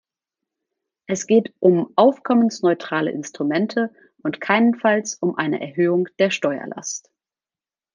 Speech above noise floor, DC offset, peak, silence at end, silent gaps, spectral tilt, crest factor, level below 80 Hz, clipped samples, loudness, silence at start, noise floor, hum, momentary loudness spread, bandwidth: over 71 dB; under 0.1%; -2 dBFS; 0.95 s; none; -5 dB/octave; 18 dB; -70 dBFS; under 0.1%; -20 LUFS; 1.1 s; under -90 dBFS; none; 12 LU; 9.8 kHz